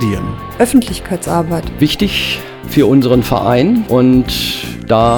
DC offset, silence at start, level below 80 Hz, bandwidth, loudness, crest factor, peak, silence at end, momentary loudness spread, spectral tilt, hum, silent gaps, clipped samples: under 0.1%; 0 s; -32 dBFS; 20 kHz; -13 LUFS; 12 dB; 0 dBFS; 0 s; 10 LU; -5.5 dB/octave; none; none; under 0.1%